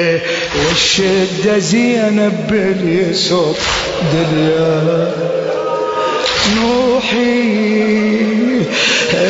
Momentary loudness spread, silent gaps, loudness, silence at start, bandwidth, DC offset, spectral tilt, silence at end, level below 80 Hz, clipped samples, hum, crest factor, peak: 4 LU; none; -13 LUFS; 0 s; 8 kHz; under 0.1%; -4.5 dB/octave; 0 s; -40 dBFS; under 0.1%; none; 12 dB; -2 dBFS